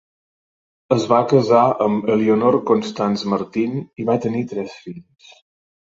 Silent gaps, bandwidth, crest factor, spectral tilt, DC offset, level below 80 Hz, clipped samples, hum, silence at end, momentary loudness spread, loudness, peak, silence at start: none; 7.8 kHz; 18 dB; -7 dB/octave; under 0.1%; -60 dBFS; under 0.1%; none; 0.85 s; 13 LU; -18 LUFS; -2 dBFS; 0.9 s